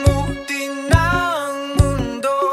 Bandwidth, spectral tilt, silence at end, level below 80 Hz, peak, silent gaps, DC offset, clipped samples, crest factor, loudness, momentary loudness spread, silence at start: 15.5 kHz; -5.5 dB/octave; 0 s; -26 dBFS; 0 dBFS; none; under 0.1%; under 0.1%; 16 dB; -19 LUFS; 7 LU; 0 s